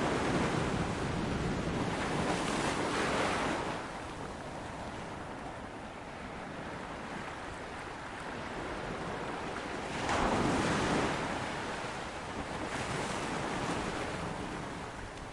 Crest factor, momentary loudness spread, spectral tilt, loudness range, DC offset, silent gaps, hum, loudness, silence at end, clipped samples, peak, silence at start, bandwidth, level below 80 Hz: 18 dB; 11 LU; -4.5 dB/octave; 9 LU; under 0.1%; none; none; -36 LUFS; 0 s; under 0.1%; -18 dBFS; 0 s; 11.5 kHz; -50 dBFS